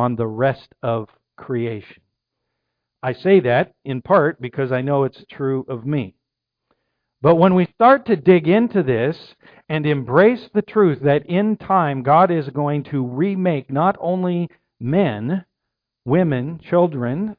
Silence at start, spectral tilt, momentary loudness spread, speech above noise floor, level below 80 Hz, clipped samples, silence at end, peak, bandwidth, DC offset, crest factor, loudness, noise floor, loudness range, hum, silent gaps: 0 s; -11 dB/octave; 12 LU; 63 dB; -58 dBFS; under 0.1%; 0.05 s; -2 dBFS; 5.2 kHz; under 0.1%; 18 dB; -19 LUFS; -80 dBFS; 5 LU; none; none